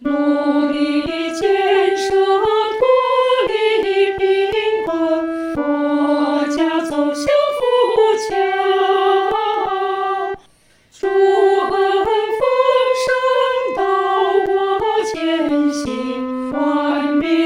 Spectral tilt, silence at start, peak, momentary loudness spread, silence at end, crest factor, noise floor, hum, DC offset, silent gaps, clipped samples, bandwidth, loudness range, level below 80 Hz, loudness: -4 dB/octave; 0 s; -2 dBFS; 5 LU; 0 s; 14 dB; -52 dBFS; none; under 0.1%; none; under 0.1%; 11 kHz; 2 LU; -52 dBFS; -16 LUFS